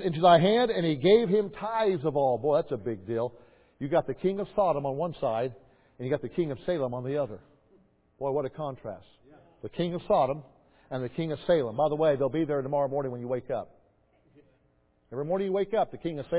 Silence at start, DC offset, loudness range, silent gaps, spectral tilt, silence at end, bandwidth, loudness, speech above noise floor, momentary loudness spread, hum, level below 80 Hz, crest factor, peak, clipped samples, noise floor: 0 s; under 0.1%; 6 LU; none; -10.5 dB/octave; 0 s; 4 kHz; -28 LUFS; 40 dB; 14 LU; none; -60 dBFS; 22 dB; -8 dBFS; under 0.1%; -68 dBFS